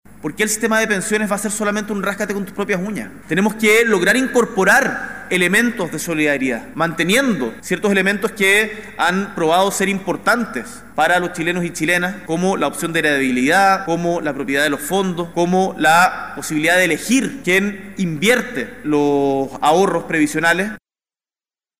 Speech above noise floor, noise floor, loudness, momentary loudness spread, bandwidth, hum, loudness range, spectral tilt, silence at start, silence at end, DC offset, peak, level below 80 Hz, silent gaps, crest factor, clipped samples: over 73 dB; under -90 dBFS; -17 LUFS; 9 LU; 16 kHz; none; 3 LU; -4 dB/octave; 0.25 s; 1 s; 0.6%; -2 dBFS; -52 dBFS; none; 16 dB; under 0.1%